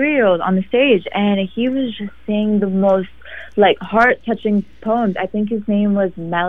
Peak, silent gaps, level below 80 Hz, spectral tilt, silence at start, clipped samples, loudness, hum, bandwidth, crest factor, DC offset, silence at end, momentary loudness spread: -2 dBFS; none; -48 dBFS; -8.5 dB/octave; 0 s; under 0.1%; -17 LUFS; none; 5 kHz; 16 dB; 1%; 0 s; 7 LU